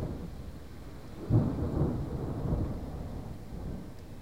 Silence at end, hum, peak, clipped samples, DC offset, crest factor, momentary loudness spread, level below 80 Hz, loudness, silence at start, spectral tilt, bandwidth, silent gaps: 0 s; none; -14 dBFS; under 0.1%; 0.4%; 18 dB; 17 LU; -42 dBFS; -35 LUFS; 0 s; -9 dB/octave; 16 kHz; none